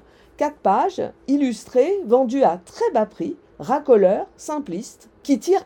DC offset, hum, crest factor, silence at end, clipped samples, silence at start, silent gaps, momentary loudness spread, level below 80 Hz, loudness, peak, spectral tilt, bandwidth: under 0.1%; none; 16 dB; 0 s; under 0.1%; 0.4 s; none; 14 LU; -60 dBFS; -20 LUFS; -4 dBFS; -6 dB/octave; 17 kHz